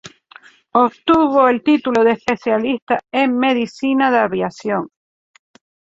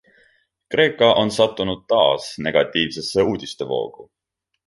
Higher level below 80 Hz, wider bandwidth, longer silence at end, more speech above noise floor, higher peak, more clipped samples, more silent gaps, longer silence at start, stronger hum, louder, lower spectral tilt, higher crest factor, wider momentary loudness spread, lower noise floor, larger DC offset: about the same, -56 dBFS vs -52 dBFS; second, 7.8 kHz vs 11.5 kHz; first, 1.1 s vs 0.65 s; second, 30 dB vs 41 dB; about the same, 0 dBFS vs -2 dBFS; neither; first, 2.82-2.87 s vs none; second, 0.05 s vs 0.7 s; neither; first, -16 LUFS vs -19 LUFS; about the same, -5.5 dB/octave vs -4.5 dB/octave; about the same, 16 dB vs 18 dB; about the same, 8 LU vs 10 LU; second, -46 dBFS vs -61 dBFS; neither